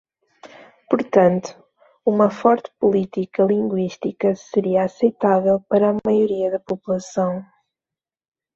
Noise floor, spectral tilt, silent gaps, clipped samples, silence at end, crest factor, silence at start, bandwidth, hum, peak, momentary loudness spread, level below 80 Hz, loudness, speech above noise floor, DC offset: -89 dBFS; -7.5 dB/octave; none; under 0.1%; 1.1 s; 18 dB; 0.45 s; 7.6 kHz; none; -2 dBFS; 8 LU; -62 dBFS; -20 LUFS; 71 dB; under 0.1%